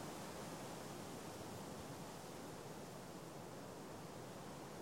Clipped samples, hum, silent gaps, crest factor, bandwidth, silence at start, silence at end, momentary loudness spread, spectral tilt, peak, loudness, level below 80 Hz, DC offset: under 0.1%; none; none; 14 dB; 16.5 kHz; 0 s; 0 s; 3 LU; -4.5 dB/octave; -38 dBFS; -52 LUFS; -74 dBFS; under 0.1%